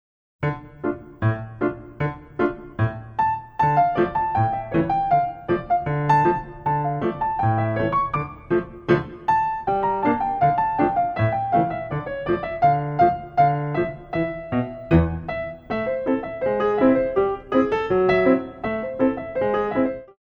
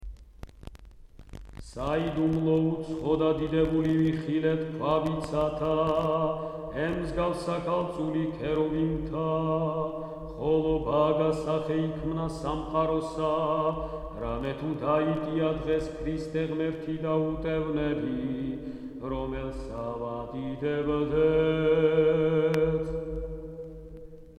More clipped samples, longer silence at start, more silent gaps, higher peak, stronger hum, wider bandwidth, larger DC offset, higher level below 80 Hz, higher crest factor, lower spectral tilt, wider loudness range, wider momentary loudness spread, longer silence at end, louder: neither; first, 0.4 s vs 0 s; neither; first, -4 dBFS vs -12 dBFS; neither; second, 6.8 kHz vs 10.5 kHz; neither; about the same, -44 dBFS vs -44 dBFS; about the same, 18 dB vs 16 dB; first, -9.5 dB/octave vs -8 dB/octave; about the same, 3 LU vs 5 LU; second, 9 LU vs 12 LU; about the same, 0.15 s vs 0.05 s; first, -22 LUFS vs -28 LUFS